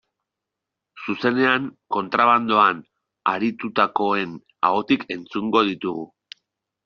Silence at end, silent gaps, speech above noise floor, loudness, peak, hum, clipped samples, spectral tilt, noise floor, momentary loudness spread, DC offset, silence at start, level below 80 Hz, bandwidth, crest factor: 0.8 s; none; 63 dB; -21 LUFS; -2 dBFS; none; under 0.1%; -2.5 dB/octave; -84 dBFS; 12 LU; under 0.1%; 0.95 s; -66 dBFS; 6.8 kHz; 20 dB